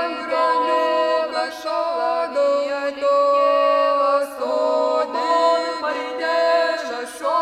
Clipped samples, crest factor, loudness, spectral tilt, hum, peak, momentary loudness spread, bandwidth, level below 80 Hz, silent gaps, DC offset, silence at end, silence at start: under 0.1%; 14 dB; -20 LUFS; -1.5 dB/octave; none; -6 dBFS; 7 LU; 13.5 kHz; -66 dBFS; none; under 0.1%; 0 s; 0 s